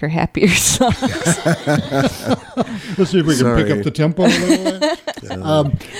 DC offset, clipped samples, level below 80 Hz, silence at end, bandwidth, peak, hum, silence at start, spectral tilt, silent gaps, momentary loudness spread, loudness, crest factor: under 0.1%; under 0.1%; -38 dBFS; 0 s; 16.5 kHz; 0 dBFS; none; 0 s; -4.5 dB/octave; none; 9 LU; -16 LUFS; 16 dB